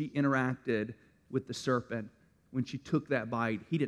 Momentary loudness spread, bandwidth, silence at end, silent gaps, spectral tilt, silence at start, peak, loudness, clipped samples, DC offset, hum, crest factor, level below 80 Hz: 11 LU; 12 kHz; 0 s; none; -6.5 dB/octave; 0 s; -16 dBFS; -34 LUFS; under 0.1%; under 0.1%; none; 18 dB; -68 dBFS